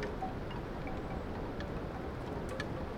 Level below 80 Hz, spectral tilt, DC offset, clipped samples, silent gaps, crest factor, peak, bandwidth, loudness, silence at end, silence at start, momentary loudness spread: -46 dBFS; -7 dB/octave; under 0.1%; under 0.1%; none; 16 dB; -22 dBFS; 17 kHz; -41 LUFS; 0 s; 0 s; 2 LU